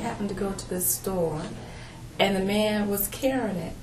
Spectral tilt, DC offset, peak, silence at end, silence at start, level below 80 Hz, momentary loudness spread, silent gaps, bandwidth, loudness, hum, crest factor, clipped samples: -4 dB/octave; under 0.1%; -6 dBFS; 0 s; 0 s; -46 dBFS; 15 LU; none; 14.5 kHz; -26 LUFS; none; 22 dB; under 0.1%